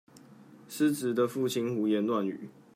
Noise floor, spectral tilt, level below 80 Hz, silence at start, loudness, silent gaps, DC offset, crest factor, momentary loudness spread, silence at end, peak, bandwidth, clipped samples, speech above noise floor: -54 dBFS; -5.5 dB/octave; -80 dBFS; 0.15 s; -30 LUFS; none; under 0.1%; 16 dB; 9 LU; 0.25 s; -16 dBFS; 16 kHz; under 0.1%; 25 dB